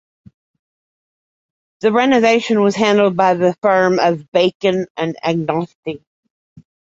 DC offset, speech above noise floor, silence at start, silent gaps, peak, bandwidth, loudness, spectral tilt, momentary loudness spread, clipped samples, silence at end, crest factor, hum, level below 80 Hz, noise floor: under 0.1%; over 75 dB; 1.85 s; 4.28-4.32 s, 4.55-4.60 s, 4.90-4.95 s, 5.75-5.83 s; 0 dBFS; 8 kHz; -15 LUFS; -5.5 dB/octave; 9 LU; under 0.1%; 0.95 s; 16 dB; none; -60 dBFS; under -90 dBFS